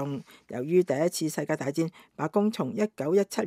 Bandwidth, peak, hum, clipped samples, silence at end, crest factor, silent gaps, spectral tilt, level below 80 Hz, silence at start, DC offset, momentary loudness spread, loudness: 16 kHz; -12 dBFS; none; under 0.1%; 0 s; 16 dB; none; -6 dB/octave; -78 dBFS; 0 s; under 0.1%; 10 LU; -28 LUFS